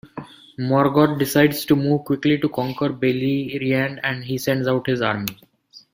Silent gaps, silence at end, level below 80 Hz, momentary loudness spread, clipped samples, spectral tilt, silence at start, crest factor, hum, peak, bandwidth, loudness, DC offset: none; 0.15 s; -56 dBFS; 9 LU; under 0.1%; -6 dB/octave; 0.05 s; 18 dB; none; -2 dBFS; 16.5 kHz; -20 LUFS; under 0.1%